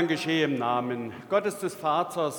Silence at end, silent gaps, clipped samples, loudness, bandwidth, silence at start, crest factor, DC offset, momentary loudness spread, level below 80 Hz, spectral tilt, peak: 0 s; none; under 0.1%; -27 LUFS; 19.5 kHz; 0 s; 16 dB; under 0.1%; 6 LU; -74 dBFS; -5 dB/octave; -10 dBFS